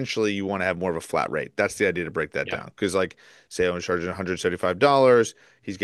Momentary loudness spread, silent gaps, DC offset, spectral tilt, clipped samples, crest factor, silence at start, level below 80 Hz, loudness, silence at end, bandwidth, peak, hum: 11 LU; none; under 0.1%; -4.5 dB/octave; under 0.1%; 20 dB; 0 s; -56 dBFS; -24 LUFS; 0 s; 12.5 kHz; -4 dBFS; none